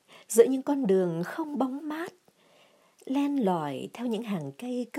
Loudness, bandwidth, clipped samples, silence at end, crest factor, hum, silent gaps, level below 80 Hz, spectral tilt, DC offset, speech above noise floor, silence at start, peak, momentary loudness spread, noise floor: -28 LUFS; 15.5 kHz; under 0.1%; 0 s; 22 dB; none; none; -84 dBFS; -6 dB/octave; under 0.1%; 34 dB; 0.1 s; -6 dBFS; 12 LU; -61 dBFS